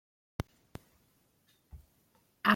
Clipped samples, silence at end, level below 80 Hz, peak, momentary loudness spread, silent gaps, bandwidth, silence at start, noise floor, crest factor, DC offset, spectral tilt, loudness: under 0.1%; 0 s; -60 dBFS; -10 dBFS; 18 LU; none; 16.5 kHz; 0.4 s; -71 dBFS; 28 dB; under 0.1%; -5.5 dB/octave; -41 LUFS